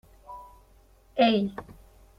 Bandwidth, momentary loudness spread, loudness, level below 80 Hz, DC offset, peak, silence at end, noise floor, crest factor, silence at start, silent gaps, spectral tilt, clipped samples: 13.5 kHz; 23 LU; -25 LUFS; -56 dBFS; under 0.1%; -6 dBFS; 0.45 s; -58 dBFS; 24 dB; 0.3 s; none; -7 dB/octave; under 0.1%